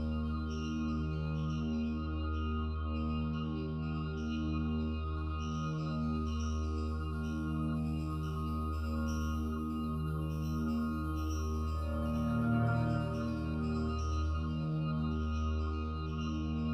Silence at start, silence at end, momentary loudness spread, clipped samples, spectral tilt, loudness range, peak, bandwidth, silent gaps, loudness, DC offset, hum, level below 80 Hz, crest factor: 0 s; 0 s; 3 LU; under 0.1%; -8 dB/octave; 2 LU; -22 dBFS; 6.4 kHz; none; -36 LUFS; under 0.1%; none; -40 dBFS; 14 dB